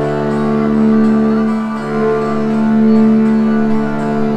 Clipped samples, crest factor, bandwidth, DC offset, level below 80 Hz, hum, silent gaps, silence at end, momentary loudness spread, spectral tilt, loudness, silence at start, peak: under 0.1%; 10 dB; 8 kHz; under 0.1%; -40 dBFS; none; none; 0 s; 6 LU; -8.5 dB/octave; -13 LUFS; 0 s; -2 dBFS